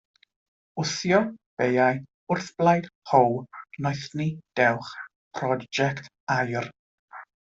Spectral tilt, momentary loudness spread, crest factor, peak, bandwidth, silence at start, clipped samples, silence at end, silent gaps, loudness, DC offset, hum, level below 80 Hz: -5.5 dB/octave; 17 LU; 22 dB; -4 dBFS; 8 kHz; 0.75 s; under 0.1%; 0.35 s; 1.46-1.57 s, 2.14-2.27 s, 2.95-3.02 s, 5.16-5.31 s, 6.20-6.27 s, 6.79-7.08 s; -25 LUFS; under 0.1%; none; -66 dBFS